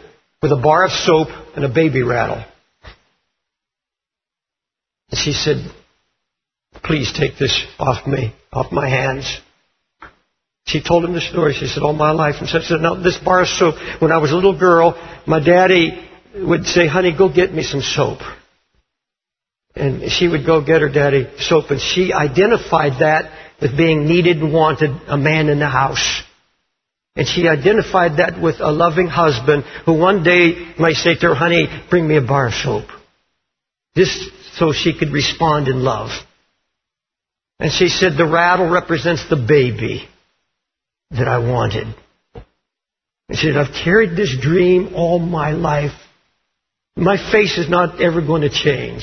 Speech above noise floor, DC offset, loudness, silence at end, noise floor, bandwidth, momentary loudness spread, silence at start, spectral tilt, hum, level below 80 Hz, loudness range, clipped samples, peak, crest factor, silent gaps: 72 dB; under 0.1%; -15 LUFS; 0 s; -87 dBFS; 6.6 kHz; 10 LU; 0.45 s; -5.5 dB/octave; none; -42 dBFS; 7 LU; under 0.1%; 0 dBFS; 16 dB; none